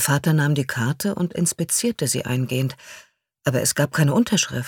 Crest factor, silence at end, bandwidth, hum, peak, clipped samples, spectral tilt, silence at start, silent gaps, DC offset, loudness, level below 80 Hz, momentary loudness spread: 18 dB; 0 s; 19 kHz; none; -4 dBFS; under 0.1%; -4.5 dB/octave; 0 s; none; under 0.1%; -21 LUFS; -58 dBFS; 6 LU